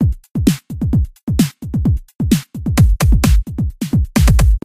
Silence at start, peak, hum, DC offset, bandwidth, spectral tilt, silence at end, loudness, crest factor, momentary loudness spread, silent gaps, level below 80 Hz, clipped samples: 0 s; 0 dBFS; none; under 0.1%; 16 kHz; -6 dB/octave; 0.05 s; -16 LUFS; 14 dB; 7 LU; 1.23-1.27 s, 2.15-2.19 s; -18 dBFS; under 0.1%